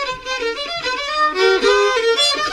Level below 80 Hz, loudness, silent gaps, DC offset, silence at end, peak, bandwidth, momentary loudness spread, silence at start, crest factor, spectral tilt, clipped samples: -48 dBFS; -16 LUFS; none; under 0.1%; 0 s; -2 dBFS; 14 kHz; 8 LU; 0 s; 14 dB; -1 dB/octave; under 0.1%